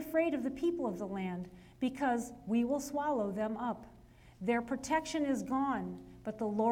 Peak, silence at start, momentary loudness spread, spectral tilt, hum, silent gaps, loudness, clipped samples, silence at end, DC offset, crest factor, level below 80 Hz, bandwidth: -20 dBFS; 0 s; 8 LU; -5.5 dB/octave; none; none; -35 LUFS; under 0.1%; 0 s; under 0.1%; 16 dB; -62 dBFS; 18 kHz